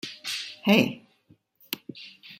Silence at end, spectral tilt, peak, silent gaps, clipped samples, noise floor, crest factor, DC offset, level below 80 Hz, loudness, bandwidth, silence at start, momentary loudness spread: 0.05 s; -4.5 dB/octave; -6 dBFS; none; under 0.1%; -62 dBFS; 24 dB; under 0.1%; -70 dBFS; -26 LUFS; 16.5 kHz; 0.05 s; 22 LU